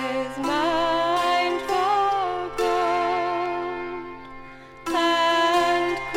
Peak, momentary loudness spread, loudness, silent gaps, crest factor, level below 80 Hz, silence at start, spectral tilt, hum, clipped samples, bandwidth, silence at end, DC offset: -10 dBFS; 16 LU; -23 LUFS; none; 14 dB; -52 dBFS; 0 s; -3.5 dB/octave; none; under 0.1%; 16 kHz; 0 s; under 0.1%